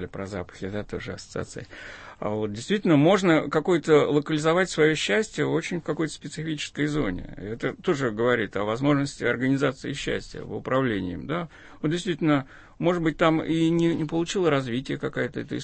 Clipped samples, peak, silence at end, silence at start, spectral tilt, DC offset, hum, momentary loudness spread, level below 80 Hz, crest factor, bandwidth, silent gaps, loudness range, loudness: under 0.1%; -8 dBFS; 0 s; 0 s; -6 dB/octave; under 0.1%; none; 14 LU; -50 dBFS; 18 dB; 8.8 kHz; none; 6 LU; -25 LUFS